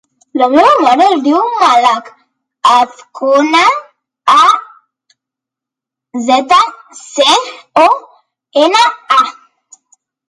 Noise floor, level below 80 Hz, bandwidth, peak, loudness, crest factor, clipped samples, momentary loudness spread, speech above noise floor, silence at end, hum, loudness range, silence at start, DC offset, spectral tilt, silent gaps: -84 dBFS; -60 dBFS; 11.5 kHz; 0 dBFS; -10 LUFS; 12 dB; under 0.1%; 11 LU; 74 dB; 1 s; none; 3 LU; 0.35 s; under 0.1%; -1.5 dB/octave; none